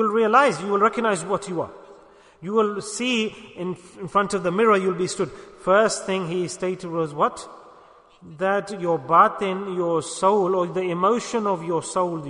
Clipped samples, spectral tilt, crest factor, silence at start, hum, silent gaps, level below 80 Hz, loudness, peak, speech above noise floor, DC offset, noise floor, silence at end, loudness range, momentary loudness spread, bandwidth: under 0.1%; -4.5 dB/octave; 20 dB; 0 s; none; none; -62 dBFS; -22 LUFS; -4 dBFS; 29 dB; under 0.1%; -51 dBFS; 0 s; 4 LU; 12 LU; 11 kHz